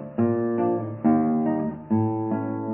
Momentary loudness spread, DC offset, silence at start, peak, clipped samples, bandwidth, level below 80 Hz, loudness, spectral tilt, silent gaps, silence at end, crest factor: 5 LU; under 0.1%; 0 s; -10 dBFS; under 0.1%; 3 kHz; -58 dBFS; -24 LUFS; -14 dB/octave; none; 0 s; 14 dB